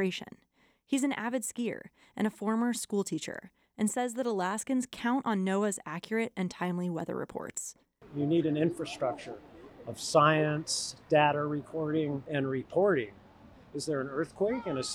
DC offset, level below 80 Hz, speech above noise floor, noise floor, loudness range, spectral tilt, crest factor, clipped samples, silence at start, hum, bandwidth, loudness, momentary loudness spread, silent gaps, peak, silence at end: under 0.1%; -68 dBFS; 24 dB; -55 dBFS; 4 LU; -5 dB/octave; 22 dB; under 0.1%; 0 s; none; 18 kHz; -31 LUFS; 14 LU; none; -10 dBFS; 0 s